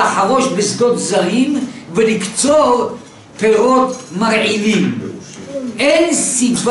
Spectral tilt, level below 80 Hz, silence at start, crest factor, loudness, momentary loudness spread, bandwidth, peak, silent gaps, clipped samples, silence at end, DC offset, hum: -3.5 dB/octave; -54 dBFS; 0 s; 12 dB; -14 LUFS; 13 LU; 11.5 kHz; -2 dBFS; none; under 0.1%; 0 s; under 0.1%; none